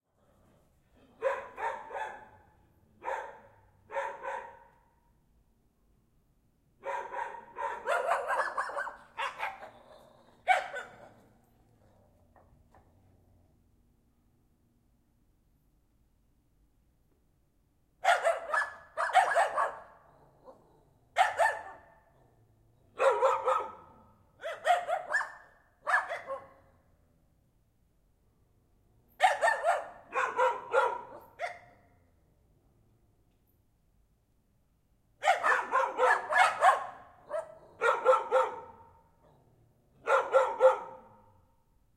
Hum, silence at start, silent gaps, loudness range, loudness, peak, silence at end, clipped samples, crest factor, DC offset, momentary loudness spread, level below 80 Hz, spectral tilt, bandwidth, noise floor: none; 1.2 s; none; 14 LU; -30 LUFS; -10 dBFS; 0.95 s; under 0.1%; 24 dB; under 0.1%; 17 LU; -72 dBFS; -1.5 dB/octave; 14 kHz; -70 dBFS